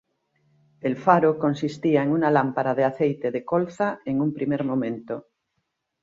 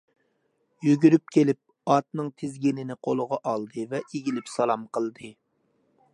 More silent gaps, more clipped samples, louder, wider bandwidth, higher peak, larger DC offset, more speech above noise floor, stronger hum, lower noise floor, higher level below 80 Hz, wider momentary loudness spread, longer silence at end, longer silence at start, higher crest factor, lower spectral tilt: neither; neither; first, -23 LUFS vs -26 LUFS; second, 7.8 kHz vs 11 kHz; about the same, -4 dBFS vs -6 dBFS; neither; first, 54 dB vs 47 dB; neither; first, -77 dBFS vs -72 dBFS; first, -66 dBFS vs -76 dBFS; second, 10 LU vs 13 LU; about the same, 0.8 s vs 0.85 s; about the same, 0.85 s vs 0.8 s; about the same, 20 dB vs 22 dB; about the same, -8 dB/octave vs -7 dB/octave